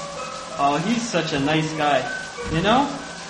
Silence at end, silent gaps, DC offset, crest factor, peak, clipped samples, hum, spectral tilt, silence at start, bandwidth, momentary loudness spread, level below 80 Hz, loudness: 0 s; none; under 0.1%; 18 dB; -4 dBFS; under 0.1%; none; -4.5 dB/octave; 0 s; 10.5 kHz; 10 LU; -46 dBFS; -22 LUFS